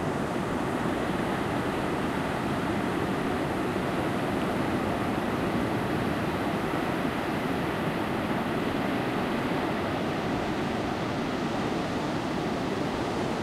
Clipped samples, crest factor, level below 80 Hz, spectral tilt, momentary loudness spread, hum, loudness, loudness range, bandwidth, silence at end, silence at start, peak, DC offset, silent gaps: under 0.1%; 14 dB; -48 dBFS; -6 dB/octave; 1 LU; none; -29 LUFS; 1 LU; 16 kHz; 0 s; 0 s; -14 dBFS; under 0.1%; none